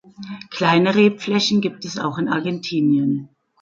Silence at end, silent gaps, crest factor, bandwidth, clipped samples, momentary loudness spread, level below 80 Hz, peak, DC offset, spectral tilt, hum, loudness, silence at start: 0.35 s; none; 16 dB; 7.6 kHz; under 0.1%; 12 LU; -64 dBFS; -2 dBFS; under 0.1%; -5.5 dB/octave; none; -19 LUFS; 0.2 s